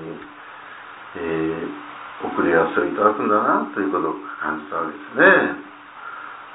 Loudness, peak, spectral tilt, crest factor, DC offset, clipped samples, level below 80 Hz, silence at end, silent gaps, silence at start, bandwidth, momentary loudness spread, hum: -20 LUFS; 0 dBFS; -9.5 dB/octave; 22 dB; under 0.1%; under 0.1%; -60 dBFS; 0 s; none; 0 s; 4 kHz; 22 LU; none